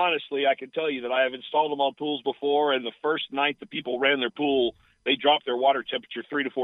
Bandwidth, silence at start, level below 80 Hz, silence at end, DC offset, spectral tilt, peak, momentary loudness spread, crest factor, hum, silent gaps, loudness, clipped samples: 4.1 kHz; 0 s; -70 dBFS; 0 s; under 0.1%; -6.5 dB/octave; -6 dBFS; 7 LU; 20 dB; none; none; -25 LUFS; under 0.1%